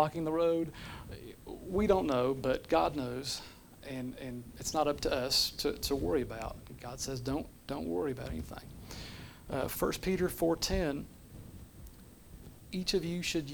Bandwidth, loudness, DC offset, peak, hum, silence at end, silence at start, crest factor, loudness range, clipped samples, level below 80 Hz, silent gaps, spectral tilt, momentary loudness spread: over 20 kHz; -34 LUFS; under 0.1%; -14 dBFS; none; 0 s; 0 s; 22 dB; 5 LU; under 0.1%; -50 dBFS; none; -4.5 dB/octave; 21 LU